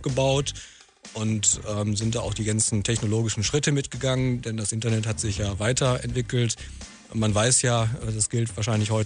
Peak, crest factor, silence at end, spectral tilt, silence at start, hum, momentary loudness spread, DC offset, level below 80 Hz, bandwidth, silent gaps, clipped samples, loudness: -6 dBFS; 18 dB; 0 s; -4 dB/octave; 0 s; none; 8 LU; under 0.1%; -44 dBFS; 10 kHz; none; under 0.1%; -24 LUFS